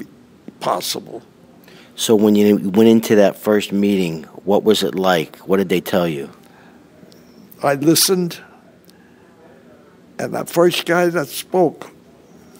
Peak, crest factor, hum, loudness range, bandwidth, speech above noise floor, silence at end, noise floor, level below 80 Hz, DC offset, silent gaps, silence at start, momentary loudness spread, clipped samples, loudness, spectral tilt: 0 dBFS; 18 dB; none; 5 LU; 16.5 kHz; 31 dB; 0.7 s; -47 dBFS; -62 dBFS; under 0.1%; none; 0 s; 14 LU; under 0.1%; -17 LUFS; -4.5 dB/octave